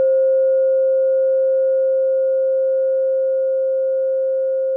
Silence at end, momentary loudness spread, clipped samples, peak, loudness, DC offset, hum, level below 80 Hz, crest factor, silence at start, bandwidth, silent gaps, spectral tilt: 0 s; 3 LU; under 0.1%; -12 dBFS; -17 LUFS; under 0.1%; none; under -90 dBFS; 6 dB; 0 s; 1.5 kHz; none; -8 dB/octave